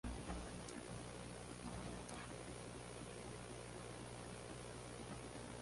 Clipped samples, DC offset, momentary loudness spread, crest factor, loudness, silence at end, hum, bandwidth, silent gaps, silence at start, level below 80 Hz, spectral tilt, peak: under 0.1%; under 0.1%; 2 LU; 16 dB; -51 LUFS; 0 s; 60 Hz at -60 dBFS; 11.5 kHz; none; 0.05 s; -60 dBFS; -4.5 dB/octave; -34 dBFS